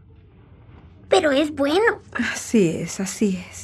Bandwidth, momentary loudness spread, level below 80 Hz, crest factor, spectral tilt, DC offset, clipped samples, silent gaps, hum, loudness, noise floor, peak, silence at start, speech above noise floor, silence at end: 14 kHz; 7 LU; -54 dBFS; 20 dB; -4.5 dB/octave; under 0.1%; under 0.1%; none; none; -21 LUFS; -48 dBFS; -4 dBFS; 0.85 s; 27 dB; 0 s